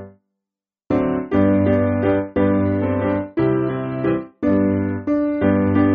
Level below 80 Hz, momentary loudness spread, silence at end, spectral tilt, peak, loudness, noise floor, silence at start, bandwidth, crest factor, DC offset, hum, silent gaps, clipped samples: -46 dBFS; 5 LU; 0 s; -8.5 dB/octave; -4 dBFS; -19 LUFS; -87 dBFS; 0 s; 4.3 kHz; 14 dB; under 0.1%; none; none; under 0.1%